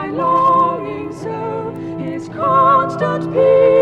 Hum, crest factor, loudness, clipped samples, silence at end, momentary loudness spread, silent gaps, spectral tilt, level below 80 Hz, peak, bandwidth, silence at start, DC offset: none; 12 dB; -16 LUFS; under 0.1%; 0 s; 14 LU; none; -8 dB/octave; -54 dBFS; -2 dBFS; 8.6 kHz; 0 s; under 0.1%